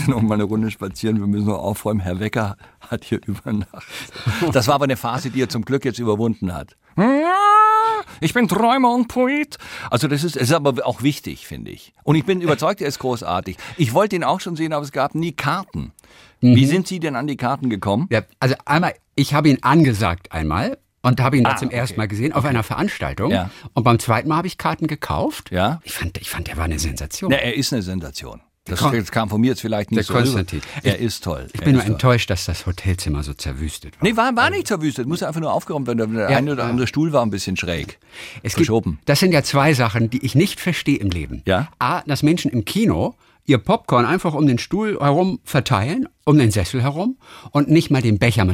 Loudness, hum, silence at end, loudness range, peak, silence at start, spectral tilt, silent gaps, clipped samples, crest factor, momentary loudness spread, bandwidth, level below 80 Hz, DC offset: -19 LUFS; none; 0 s; 5 LU; -4 dBFS; 0 s; -6 dB/octave; none; under 0.1%; 16 dB; 11 LU; 17 kHz; -42 dBFS; under 0.1%